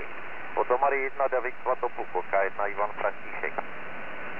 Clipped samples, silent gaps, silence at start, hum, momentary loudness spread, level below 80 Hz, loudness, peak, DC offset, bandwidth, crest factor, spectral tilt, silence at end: under 0.1%; none; 0 s; none; 13 LU; -70 dBFS; -30 LUFS; -12 dBFS; 2%; 5.6 kHz; 18 dB; -6.5 dB/octave; 0 s